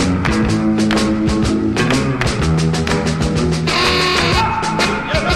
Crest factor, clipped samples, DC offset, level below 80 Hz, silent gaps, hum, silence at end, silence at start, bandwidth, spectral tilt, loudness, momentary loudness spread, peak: 14 dB; under 0.1%; under 0.1%; -28 dBFS; none; none; 0 s; 0 s; 13 kHz; -5 dB/octave; -15 LUFS; 4 LU; -2 dBFS